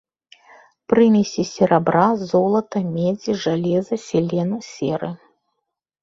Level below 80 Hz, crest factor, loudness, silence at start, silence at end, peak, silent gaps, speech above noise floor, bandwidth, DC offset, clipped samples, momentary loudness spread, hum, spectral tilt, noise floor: -58 dBFS; 18 dB; -19 LUFS; 0.9 s; 0.85 s; -2 dBFS; none; 59 dB; 7.6 kHz; under 0.1%; under 0.1%; 10 LU; none; -6.5 dB/octave; -78 dBFS